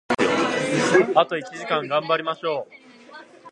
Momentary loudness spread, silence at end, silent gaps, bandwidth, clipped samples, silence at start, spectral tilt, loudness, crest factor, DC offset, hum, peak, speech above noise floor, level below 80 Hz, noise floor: 11 LU; 0 s; none; 11.5 kHz; under 0.1%; 0.1 s; -4 dB/octave; -22 LUFS; 20 dB; under 0.1%; none; -2 dBFS; 23 dB; -62 dBFS; -45 dBFS